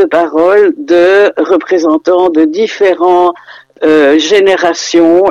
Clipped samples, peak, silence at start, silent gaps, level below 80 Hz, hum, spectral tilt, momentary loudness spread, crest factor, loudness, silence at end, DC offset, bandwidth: under 0.1%; 0 dBFS; 0 s; none; -52 dBFS; none; -3.5 dB/octave; 4 LU; 8 dB; -8 LUFS; 0 s; under 0.1%; 8.2 kHz